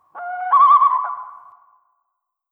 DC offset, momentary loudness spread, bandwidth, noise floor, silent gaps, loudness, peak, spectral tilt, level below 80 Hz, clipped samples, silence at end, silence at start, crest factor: under 0.1%; 19 LU; 3.7 kHz; -76 dBFS; none; -14 LUFS; -4 dBFS; -2.5 dB/octave; -80 dBFS; under 0.1%; 1.15 s; 0.15 s; 16 dB